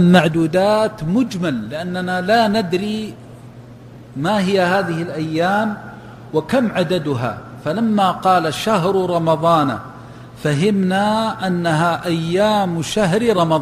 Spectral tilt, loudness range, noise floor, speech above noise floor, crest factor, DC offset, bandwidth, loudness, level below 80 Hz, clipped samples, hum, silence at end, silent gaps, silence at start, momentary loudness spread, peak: -6 dB/octave; 3 LU; -38 dBFS; 22 dB; 18 dB; under 0.1%; 15.5 kHz; -18 LUFS; -50 dBFS; under 0.1%; none; 0 s; none; 0 s; 10 LU; 0 dBFS